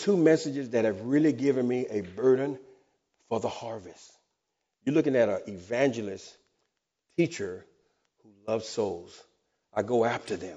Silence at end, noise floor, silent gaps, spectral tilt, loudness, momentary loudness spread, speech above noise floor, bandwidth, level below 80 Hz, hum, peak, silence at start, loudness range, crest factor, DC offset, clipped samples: 0 s; -82 dBFS; none; -6 dB/octave; -28 LUFS; 15 LU; 55 dB; 8 kHz; -72 dBFS; none; -10 dBFS; 0 s; 7 LU; 20 dB; under 0.1%; under 0.1%